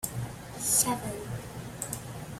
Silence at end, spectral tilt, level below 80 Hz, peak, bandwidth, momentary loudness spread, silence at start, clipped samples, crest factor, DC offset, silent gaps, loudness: 0 s; -3 dB/octave; -54 dBFS; -12 dBFS; 16.5 kHz; 15 LU; 0 s; under 0.1%; 22 dB; under 0.1%; none; -30 LUFS